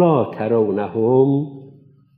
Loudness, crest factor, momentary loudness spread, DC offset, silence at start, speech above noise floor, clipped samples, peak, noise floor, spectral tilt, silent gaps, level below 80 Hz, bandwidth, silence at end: -18 LUFS; 14 dB; 6 LU; under 0.1%; 0 s; 31 dB; under 0.1%; -4 dBFS; -48 dBFS; -12 dB/octave; none; -70 dBFS; 4.3 kHz; 0.5 s